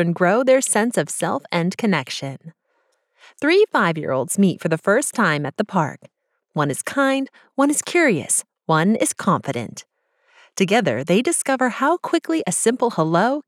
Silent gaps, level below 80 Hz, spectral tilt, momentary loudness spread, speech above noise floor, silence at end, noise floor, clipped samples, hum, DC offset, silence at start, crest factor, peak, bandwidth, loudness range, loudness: none; -76 dBFS; -4.5 dB/octave; 9 LU; 48 dB; 0.05 s; -67 dBFS; under 0.1%; none; under 0.1%; 0 s; 16 dB; -4 dBFS; 16 kHz; 2 LU; -19 LUFS